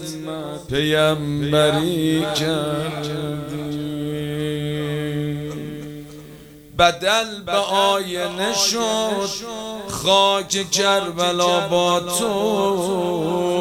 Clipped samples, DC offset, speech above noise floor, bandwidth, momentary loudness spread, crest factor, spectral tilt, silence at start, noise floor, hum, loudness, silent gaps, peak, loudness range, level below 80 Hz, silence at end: under 0.1%; under 0.1%; 22 dB; over 20 kHz; 12 LU; 20 dB; -4 dB/octave; 0 s; -41 dBFS; none; -20 LUFS; none; -2 dBFS; 7 LU; -50 dBFS; 0 s